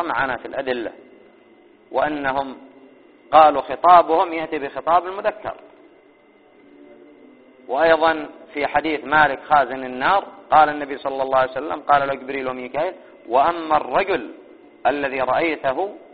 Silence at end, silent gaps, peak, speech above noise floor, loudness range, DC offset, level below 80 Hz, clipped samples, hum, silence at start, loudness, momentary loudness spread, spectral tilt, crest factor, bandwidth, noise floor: 0.1 s; none; 0 dBFS; 33 dB; 7 LU; 0.1%; -54 dBFS; under 0.1%; none; 0 s; -19 LUFS; 13 LU; -2 dB/octave; 20 dB; 4.8 kHz; -52 dBFS